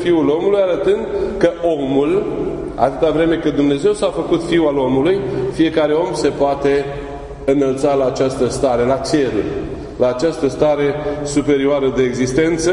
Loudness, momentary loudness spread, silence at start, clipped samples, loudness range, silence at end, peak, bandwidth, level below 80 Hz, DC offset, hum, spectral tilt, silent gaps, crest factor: -16 LUFS; 6 LU; 0 s; under 0.1%; 1 LU; 0 s; 0 dBFS; 11 kHz; -38 dBFS; under 0.1%; none; -6 dB/octave; none; 16 dB